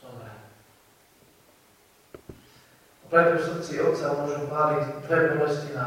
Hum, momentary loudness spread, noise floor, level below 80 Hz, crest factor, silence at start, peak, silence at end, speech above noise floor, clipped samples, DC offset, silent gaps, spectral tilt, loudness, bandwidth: none; 23 LU; -59 dBFS; -64 dBFS; 22 dB; 0.05 s; -6 dBFS; 0 s; 35 dB; under 0.1%; under 0.1%; none; -6.5 dB/octave; -24 LUFS; 16 kHz